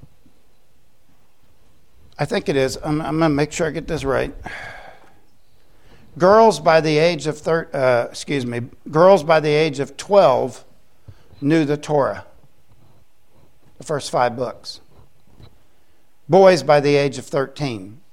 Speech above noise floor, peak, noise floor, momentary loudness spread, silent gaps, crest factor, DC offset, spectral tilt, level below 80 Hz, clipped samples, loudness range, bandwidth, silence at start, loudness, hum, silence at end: 44 dB; 0 dBFS; -61 dBFS; 16 LU; none; 20 dB; 0.7%; -5.5 dB/octave; -48 dBFS; under 0.1%; 9 LU; 13 kHz; 2.2 s; -18 LUFS; none; 0.2 s